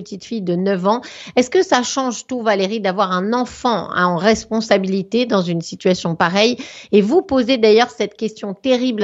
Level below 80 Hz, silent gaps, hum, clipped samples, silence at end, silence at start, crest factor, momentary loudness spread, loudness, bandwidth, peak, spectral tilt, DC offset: -54 dBFS; none; none; under 0.1%; 0 s; 0 s; 16 dB; 8 LU; -17 LUFS; 8.2 kHz; 0 dBFS; -5 dB/octave; under 0.1%